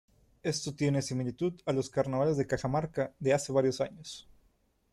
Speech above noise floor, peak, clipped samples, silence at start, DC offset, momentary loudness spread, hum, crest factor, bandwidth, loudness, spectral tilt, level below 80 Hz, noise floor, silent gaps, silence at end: 39 dB; -16 dBFS; under 0.1%; 0.45 s; under 0.1%; 8 LU; none; 16 dB; 12.5 kHz; -32 LUFS; -5.5 dB/octave; -60 dBFS; -70 dBFS; none; 0.7 s